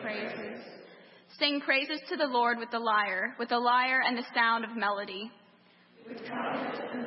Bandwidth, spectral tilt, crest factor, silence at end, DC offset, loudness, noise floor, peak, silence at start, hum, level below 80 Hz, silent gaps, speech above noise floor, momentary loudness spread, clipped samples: 5.8 kHz; -7 dB/octave; 20 dB; 0 s; under 0.1%; -29 LUFS; -61 dBFS; -10 dBFS; 0 s; none; under -90 dBFS; none; 31 dB; 16 LU; under 0.1%